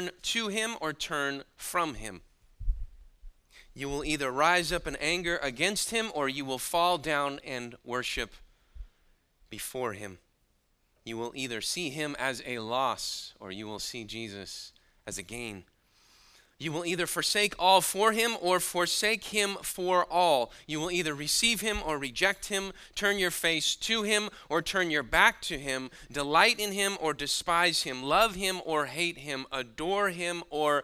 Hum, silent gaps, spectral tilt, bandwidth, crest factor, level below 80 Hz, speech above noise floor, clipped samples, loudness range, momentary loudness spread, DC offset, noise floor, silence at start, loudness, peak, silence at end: none; none; -2 dB/octave; 16 kHz; 24 dB; -48 dBFS; 41 dB; under 0.1%; 11 LU; 14 LU; under 0.1%; -71 dBFS; 0 s; -29 LUFS; -6 dBFS; 0 s